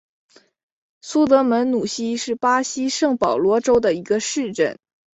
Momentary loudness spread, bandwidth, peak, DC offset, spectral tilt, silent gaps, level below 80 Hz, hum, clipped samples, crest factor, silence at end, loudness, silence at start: 8 LU; 8.2 kHz; -2 dBFS; under 0.1%; -3.5 dB/octave; none; -56 dBFS; none; under 0.1%; 18 dB; 0.4 s; -19 LUFS; 1.05 s